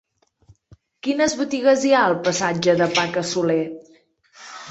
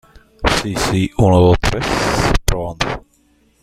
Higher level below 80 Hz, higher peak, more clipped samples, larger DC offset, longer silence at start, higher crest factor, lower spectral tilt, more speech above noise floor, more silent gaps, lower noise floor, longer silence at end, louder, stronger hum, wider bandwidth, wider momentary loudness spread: second, -62 dBFS vs -26 dBFS; second, -4 dBFS vs 0 dBFS; neither; neither; first, 1.05 s vs 0.4 s; about the same, 18 dB vs 16 dB; about the same, -4 dB/octave vs -5 dB/octave; second, 36 dB vs 41 dB; neither; about the same, -56 dBFS vs -56 dBFS; second, 0 s vs 0.65 s; second, -20 LUFS vs -16 LUFS; neither; second, 8.4 kHz vs 15.5 kHz; first, 14 LU vs 10 LU